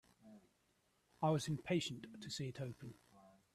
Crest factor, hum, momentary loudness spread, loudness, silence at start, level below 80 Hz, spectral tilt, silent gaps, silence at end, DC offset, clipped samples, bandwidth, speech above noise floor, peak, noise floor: 20 dB; none; 14 LU; -42 LUFS; 0.25 s; -76 dBFS; -5.5 dB/octave; none; 0.25 s; under 0.1%; under 0.1%; 13.5 kHz; 37 dB; -24 dBFS; -79 dBFS